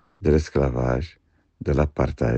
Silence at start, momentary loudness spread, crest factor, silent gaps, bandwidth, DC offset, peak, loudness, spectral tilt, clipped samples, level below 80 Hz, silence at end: 0.2 s; 9 LU; 18 dB; none; 8.2 kHz; under 0.1%; -6 dBFS; -23 LUFS; -8 dB/octave; under 0.1%; -32 dBFS; 0 s